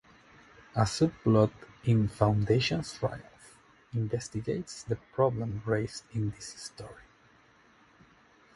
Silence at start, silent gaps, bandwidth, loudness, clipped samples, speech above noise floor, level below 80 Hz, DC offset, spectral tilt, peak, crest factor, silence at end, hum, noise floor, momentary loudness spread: 0.75 s; none; 11.5 kHz; -30 LUFS; under 0.1%; 32 dB; -54 dBFS; under 0.1%; -6.5 dB/octave; -8 dBFS; 22 dB; 1.55 s; none; -62 dBFS; 16 LU